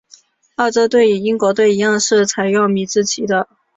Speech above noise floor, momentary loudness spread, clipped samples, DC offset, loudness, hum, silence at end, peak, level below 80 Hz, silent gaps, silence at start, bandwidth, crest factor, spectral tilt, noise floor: 34 dB; 6 LU; under 0.1%; under 0.1%; -15 LUFS; none; 0.35 s; -2 dBFS; -60 dBFS; none; 0.6 s; 8 kHz; 12 dB; -3.5 dB/octave; -48 dBFS